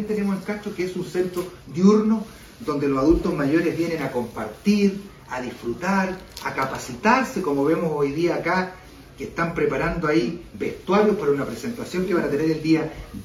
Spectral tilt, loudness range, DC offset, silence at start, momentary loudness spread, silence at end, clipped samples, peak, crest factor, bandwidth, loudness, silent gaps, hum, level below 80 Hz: -6.5 dB/octave; 2 LU; under 0.1%; 0 s; 12 LU; 0 s; under 0.1%; -4 dBFS; 18 dB; 15 kHz; -23 LUFS; none; none; -44 dBFS